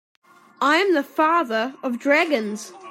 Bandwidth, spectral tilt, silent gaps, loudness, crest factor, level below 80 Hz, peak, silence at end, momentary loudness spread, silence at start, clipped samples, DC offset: 16 kHz; -3.5 dB/octave; none; -20 LUFS; 16 dB; -78 dBFS; -6 dBFS; 0 s; 8 LU; 0.6 s; under 0.1%; under 0.1%